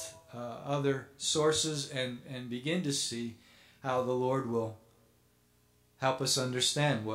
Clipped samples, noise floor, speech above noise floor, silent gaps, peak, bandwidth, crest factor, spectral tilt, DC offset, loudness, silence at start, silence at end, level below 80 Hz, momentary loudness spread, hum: under 0.1%; -68 dBFS; 35 dB; none; -14 dBFS; 16 kHz; 20 dB; -3.5 dB/octave; under 0.1%; -32 LUFS; 0 s; 0 s; -70 dBFS; 13 LU; 60 Hz at -65 dBFS